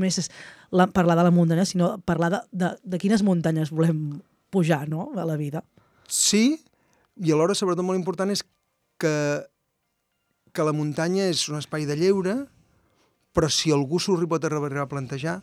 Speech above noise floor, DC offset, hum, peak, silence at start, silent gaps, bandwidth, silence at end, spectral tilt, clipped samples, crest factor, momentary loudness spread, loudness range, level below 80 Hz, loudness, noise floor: 53 dB; under 0.1%; none; -6 dBFS; 0 s; none; 14 kHz; 0 s; -5 dB/octave; under 0.1%; 18 dB; 10 LU; 5 LU; -56 dBFS; -24 LUFS; -76 dBFS